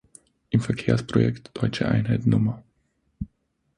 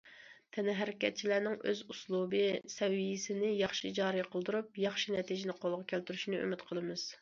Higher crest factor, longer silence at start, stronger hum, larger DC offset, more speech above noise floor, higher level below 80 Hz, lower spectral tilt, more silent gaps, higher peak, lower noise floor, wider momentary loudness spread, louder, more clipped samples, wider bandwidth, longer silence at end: about the same, 20 dB vs 20 dB; first, 0.5 s vs 0.05 s; neither; neither; first, 49 dB vs 22 dB; first, -48 dBFS vs -78 dBFS; first, -7.5 dB/octave vs -3.5 dB/octave; neither; first, -6 dBFS vs -16 dBFS; first, -71 dBFS vs -57 dBFS; first, 17 LU vs 6 LU; first, -24 LUFS vs -36 LUFS; neither; first, 10.5 kHz vs 7.4 kHz; first, 0.5 s vs 0.05 s